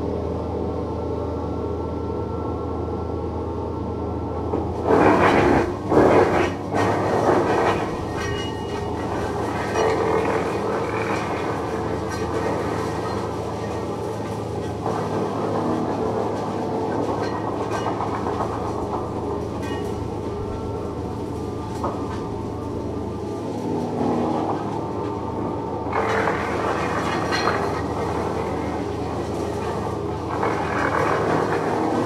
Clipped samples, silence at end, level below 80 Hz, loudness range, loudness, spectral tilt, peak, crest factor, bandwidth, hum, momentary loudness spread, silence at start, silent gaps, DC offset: under 0.1%; 0 s; -40 dBFS; 8 LU; -24 LUFS; -6.5 dB/octave; -2 dBFS; 20 dB; 14 kHz; none; 9 LU; 0 s; none; under 0.1%